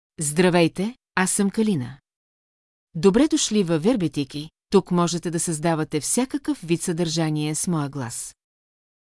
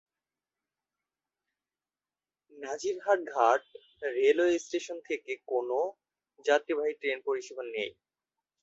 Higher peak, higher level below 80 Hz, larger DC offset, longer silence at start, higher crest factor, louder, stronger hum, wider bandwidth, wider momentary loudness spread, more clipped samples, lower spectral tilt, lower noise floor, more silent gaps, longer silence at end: first, -4 dBFS vs -10 dBFS; first, -54 dBFS vs -80 dBFS; neither; second, 0.2 s vs 2.55 s; about the same, 20 dB vs 22 dB; first, -22 LUFS vs -31 LUFS; neither; first, 12 kHz vs 8 kHz; about the same, 11 LU vs 11 LU; neither; first, -4.5 dB/octave vs -2.5 dB/octave; about the same, under -90 dBFS vs under -90 dBFS; first, 2.16-2.87 s vs none; first, 0.85 s vs 0.7 s